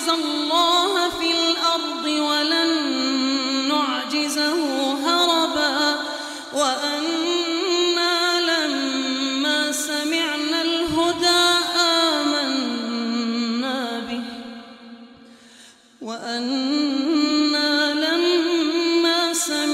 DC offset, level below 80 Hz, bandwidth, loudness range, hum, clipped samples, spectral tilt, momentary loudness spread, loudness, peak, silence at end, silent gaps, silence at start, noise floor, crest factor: under 0.1%; -60 dBFS; 16 kHz; 7 LU; none; under 0.1%; -1.5 dB/octave; 8 LU; -20 LUFS; -6 dBFS; 0 s; none; 0 s; -49 dBFS; 16 dB